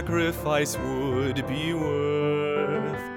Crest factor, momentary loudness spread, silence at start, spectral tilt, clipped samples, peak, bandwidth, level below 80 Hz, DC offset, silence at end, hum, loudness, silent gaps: 14 dB; 3 LU; 0 s; -5.5 dB/octave; under 0.1%; -12 dBFS; 17 kHz; -46 dBFS; under 0.1%; 0 s; none; -26 LUFS; none